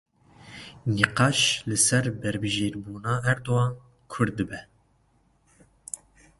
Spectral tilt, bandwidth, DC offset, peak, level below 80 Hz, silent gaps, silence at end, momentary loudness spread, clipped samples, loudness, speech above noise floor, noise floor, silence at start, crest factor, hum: -3.5 dB/octave; 11.5 kHz; under 0.1%; -2 dBFS; -54 dBFS; none; 0.45 s; 20 LU; under 0.1%; -25 LUFS; 40 dB; -65 dBFS; 0.45 s; 26 dB; none